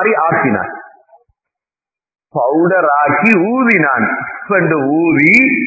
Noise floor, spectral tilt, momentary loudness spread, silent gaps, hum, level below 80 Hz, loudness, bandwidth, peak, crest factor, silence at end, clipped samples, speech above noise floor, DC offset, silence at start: under -90 dBFS; -8 dB/octave; 11 LU; none; none; -56 dBFS; -12 LUFS; 8 kHz; 0 dBFS; 14 dB; 0 s; under 0.1%; over 78 dB; under 0.1%; 0 s